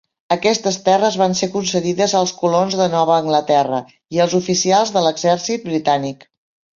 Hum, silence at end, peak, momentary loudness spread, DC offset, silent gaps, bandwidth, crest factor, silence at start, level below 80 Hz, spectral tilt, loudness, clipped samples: none; 0.6 s; -2 dBFS; 6 LU; under 0.1%; none; 7.6 kHz; 16 dB; 0.3 s; -60 dBFS; -4 dB/octave; -17 LUFS; under 0.1%